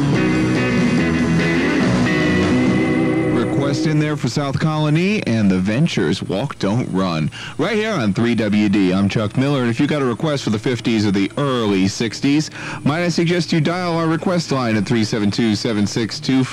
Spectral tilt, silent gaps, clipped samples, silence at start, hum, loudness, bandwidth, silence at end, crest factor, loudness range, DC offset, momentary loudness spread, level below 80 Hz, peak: -6 dB/octave; none; under 0.1%; 0 s; none; -18 LUFS; 12.5 kHz; 0 s; 12 dB; 2 LU; under 0.1%; 4 LU; -44 dBFS; -4 dBFS